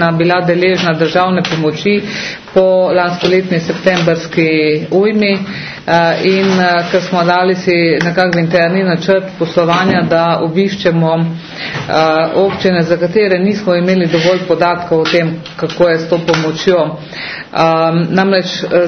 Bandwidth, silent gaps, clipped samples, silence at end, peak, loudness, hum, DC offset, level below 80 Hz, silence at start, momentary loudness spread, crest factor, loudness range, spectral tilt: 6.6 kHz; none; under 0.1%; 0 s; 0 dBFS; -12 LUFS; none; under 0.1%; -50 dBFS; 0 s; 5 LU; 12 dB; 1 LU; -6 dB/octave